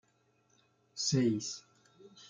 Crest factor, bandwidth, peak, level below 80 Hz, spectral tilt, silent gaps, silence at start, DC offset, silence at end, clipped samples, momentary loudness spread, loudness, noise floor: 18 dB; 9.6 kHz; -18 dBFS; -76 dBFS; -4.5 dB/octave; none; 0.95 s; under 0.1%; 0.05 s; under 0.1%; 17 LU; -33 LUFS; -73 dBFS